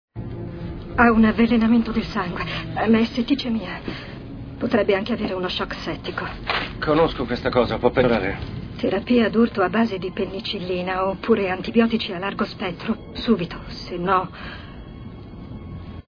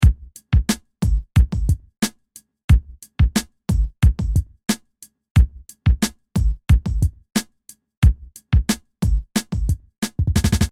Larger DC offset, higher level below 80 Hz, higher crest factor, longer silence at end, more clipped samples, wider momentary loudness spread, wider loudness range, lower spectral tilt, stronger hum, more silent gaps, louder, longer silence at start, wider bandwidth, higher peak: neither; second, -40 dBFS vs -22 dBFS; about the same, 20 dB vs 16 dB; about the same, 0.05 s vs 0 s; neither; first, 17 LU vs 7 LU; first, 5 LU vs 1 LU; first, -7.5 dB/octave vs -5.5 dB/octave; neither; second, none vs 2.64-2.68 s, 5.31-5.35 s, 7.97-8.02 s; about the same, -22 LUFS vs -21 LUFS; first, 0.15 s vs 0 s; second, 5.4 kHz vs 15.5 kHz; about the same, -2 dBFS vs -4 dBFS